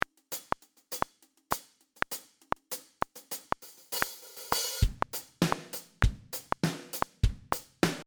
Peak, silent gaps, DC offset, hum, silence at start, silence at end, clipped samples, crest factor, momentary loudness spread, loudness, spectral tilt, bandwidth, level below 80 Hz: -6 dBFS; none; under 0.1%; none; 0.3 s; 0.05 s; under 0.1%; 28 dB; 9 LU; -34 LUFS; -4 dB/octave; over 20 kHz; -40 dBFS